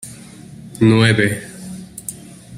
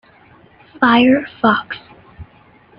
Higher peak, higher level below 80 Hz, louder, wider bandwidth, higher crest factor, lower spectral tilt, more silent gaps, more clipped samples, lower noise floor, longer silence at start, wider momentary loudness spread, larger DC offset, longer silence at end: about the same, 0 dBFS vs -2 dBFS; about the same, -50 dBFS vs -52 dBFS; about the same, -15 LUFS vs -14 LUFS; first, 15.5 kHz vs 5.4 kHz; about the same, 18 dB vs 16 dB; second, -5.5 dB/octave vs -8 dB/octave; neither; neither; second, -37 dBFS vs -48 dBFS; second, 0.05 s vs 0.8 s; first, 25 LU vs 17 LU; neither; second, 0 s vs 0.55 s